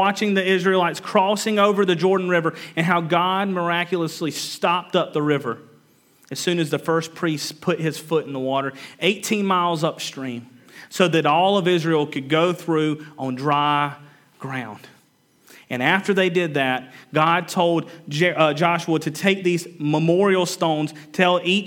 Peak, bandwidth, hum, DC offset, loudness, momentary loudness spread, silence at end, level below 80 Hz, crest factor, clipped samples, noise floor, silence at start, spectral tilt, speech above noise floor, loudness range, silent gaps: 0 dBFS; 18.5 kHz; none; under 0.1%; -21 LUFS; 10 LU; 0 s; -78 dBFS; 20 dB; under 0.1%; -59 dBFS; 0 s; -5 dB/octave; 38 dB; 4 LU; none